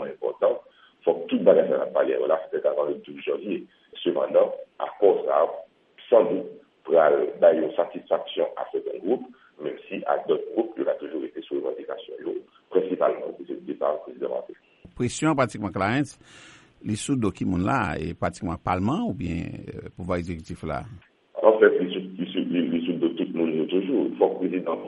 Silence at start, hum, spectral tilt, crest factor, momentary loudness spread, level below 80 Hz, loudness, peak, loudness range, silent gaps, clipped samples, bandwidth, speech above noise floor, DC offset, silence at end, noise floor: 0 s; none; -6.5 dB/octave; 22 dB; 14 LU; -54 dBFS; -25 LUFS; -2 dBFS; 6 LU; none; under 0.1%; 11.5 kHz; 24 dB; under 0.1%; 0 s; -48 dBFS